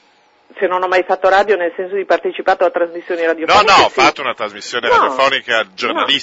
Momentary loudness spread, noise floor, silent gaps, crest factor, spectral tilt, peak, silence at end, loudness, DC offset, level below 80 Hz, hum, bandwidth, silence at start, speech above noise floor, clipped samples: 11 LU; -53 dBFS; none; 14 dB; -2.5 dB/octave; 0 dBFS; 0 s; -14 LUFS; under 0.1%; -50 dBFS; none; 8 kHz; 0.55 s; 39 dB; under 0.1%